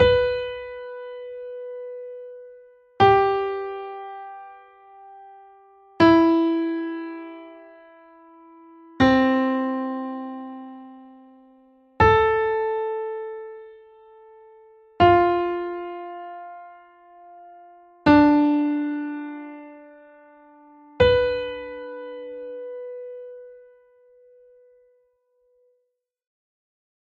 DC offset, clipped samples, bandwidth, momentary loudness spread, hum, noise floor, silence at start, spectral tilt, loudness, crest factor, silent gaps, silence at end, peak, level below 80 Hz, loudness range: under 0.1%; under 0.1%; 6.8 kHz; 23 LU; none; -76 dBFS; 0 s; -7.5 dB/octave; -21 LUFS; 20 dB; none; 3.45 s; -4 dBFS; -48 dBFS; 4 LU